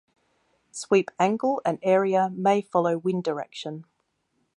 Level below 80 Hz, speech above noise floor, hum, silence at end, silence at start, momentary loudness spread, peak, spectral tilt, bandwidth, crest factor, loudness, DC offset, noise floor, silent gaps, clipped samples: -74 dBFS; 49 dB; none; 0.75 s; 0.75 s; 15 LU; -8 dBFS; -6 dB/octave; 11 kHz; 18 dB; -24 LUFS; under 0.1%; -73 dBFS; none; under 0.1%